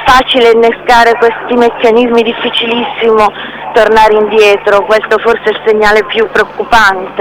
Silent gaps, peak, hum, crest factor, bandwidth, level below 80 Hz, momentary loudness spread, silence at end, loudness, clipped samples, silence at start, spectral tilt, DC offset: none; 0 dBFS; none; 8 dB; 16 kHz; -34 dBFS; 5 LU; 0 s; -8 LUFS; 3%; 0 s; -3.5 dB/octave; under 0.1%